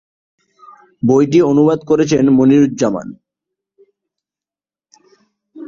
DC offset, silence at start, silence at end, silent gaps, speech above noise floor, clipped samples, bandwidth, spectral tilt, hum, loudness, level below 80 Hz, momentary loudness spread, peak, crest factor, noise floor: under 0.1%; 1.05 s; 0 s; none; over 78 dB; under 0.1%; 7.4 kHz; -7 dB/octave; none; -13 LUFS; -54 dBFS; 9 LU; -2 dBFS; 14 dB; under -90 dBFS